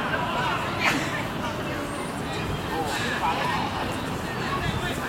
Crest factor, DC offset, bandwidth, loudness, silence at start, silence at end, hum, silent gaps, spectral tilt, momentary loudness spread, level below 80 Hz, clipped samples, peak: 20 dB; under 0.1%; 16.5 kHz; -27 LUFS; 0 s; 0 s; none; none; -4.5 dB/octave; 6 LU; -44 dBFS; under 0.1%; -8 dBFS